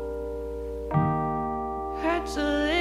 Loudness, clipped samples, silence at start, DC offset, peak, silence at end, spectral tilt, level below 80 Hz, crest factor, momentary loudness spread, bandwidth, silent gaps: -28 LUFS; under 0.1%; 0 s; under 0.1%; -12 dBFS; 0 s; -6.5 dB/octave; -40 dBFS; 16 dB; 9 LU; 14 kHz; none